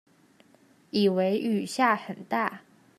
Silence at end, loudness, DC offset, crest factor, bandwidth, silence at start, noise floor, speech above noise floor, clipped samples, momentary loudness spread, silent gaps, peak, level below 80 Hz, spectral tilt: 0.4 s; -27 LUFS; under 0.1%; 20 dB; 14 kHz; 0.95 s; -60 dBFS; 34 dB; under 0.1%; 8 LU; none; -8 dBFS; -80 dBFS; -5.5 dB/octave